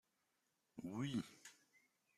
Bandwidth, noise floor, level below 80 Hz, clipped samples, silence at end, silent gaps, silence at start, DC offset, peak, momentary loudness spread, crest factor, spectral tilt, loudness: 14.5 kHz; -86 dBFS; -84 dBFS; under 0.1%; 0.65 s; none; 0.75 s; under 0.1%; -32 dBFS; 17 LU; 20 dB; -5.5 dB/octave; -47 LUFS